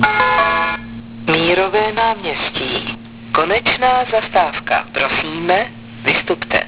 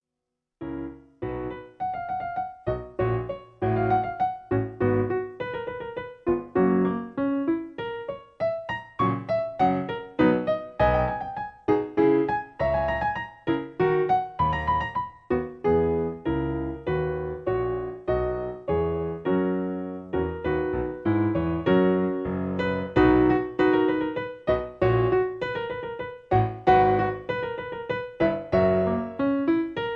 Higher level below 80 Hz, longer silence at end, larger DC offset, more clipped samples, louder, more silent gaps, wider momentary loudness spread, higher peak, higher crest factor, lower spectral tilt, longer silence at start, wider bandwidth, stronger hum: about the same, -44 dBFS vs -44 dBFS; about the same, 0 s vs 0 s; first, 0.1% vs under 0.1%; neither; first, -16 LUFS vs -26 LUFS; neither; second, 8 LU vs 11 LU; first, 0 dBFS vs -6 dBFS; about the same, 16 dB vs 20 dB; second, -8 dB/octave vs -9.5 dB/octave; second, 0 s vs 0.6 s; second, 4 kHz vs 6 kHz; neither